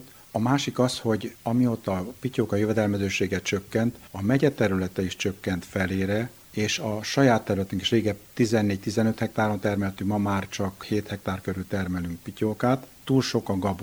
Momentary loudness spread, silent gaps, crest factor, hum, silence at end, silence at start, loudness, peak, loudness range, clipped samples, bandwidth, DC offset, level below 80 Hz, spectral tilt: 7 LU; none; 20 dB; none; 0 s; 0 s; -26 LUFS; -6 dBFS; 3 LU; under 0.1%; over 20 kHz; under 0.1%; -56 dBFS; -5.5 dB/octave